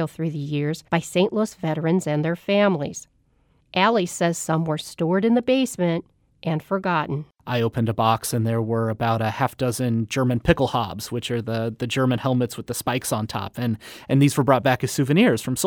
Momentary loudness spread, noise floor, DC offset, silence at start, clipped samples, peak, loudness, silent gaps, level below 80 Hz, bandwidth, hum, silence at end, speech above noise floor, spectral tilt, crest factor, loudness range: 8 LU; -62 dBFS; under 0.1%; 0 s; under 0.1%; -4 dBFS; -23 LUFS; none; -48 dBFS; over 20 kHz; none; 0 s; 40 dB; -5.5 dB/octave; 20 dB; 2 LU